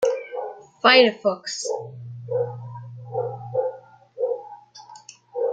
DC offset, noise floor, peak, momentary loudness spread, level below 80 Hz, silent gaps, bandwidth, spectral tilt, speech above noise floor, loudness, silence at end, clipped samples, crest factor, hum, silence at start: under 0.1%; -46 dBFS; -2 dBFS; 27 LU; -72 dBFS; none; 9.2 kHz; -3.5 dB/octave; 26 dB; -23 LUFS; 0 s; under 0.1%; 22 dB; none; 0 s